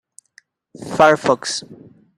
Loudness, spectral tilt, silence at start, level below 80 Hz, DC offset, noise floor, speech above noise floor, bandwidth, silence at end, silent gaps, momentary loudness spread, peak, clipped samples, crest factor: -17 LUFS; -3.5 dB/octave; 0.8 s; -60 dBFS; under 0.1%; -55 dBFS; 38 dB; 12.5 kHz; 0.45 s; none; 14 LU; 0 dBFS; under 0.1%; 20 dB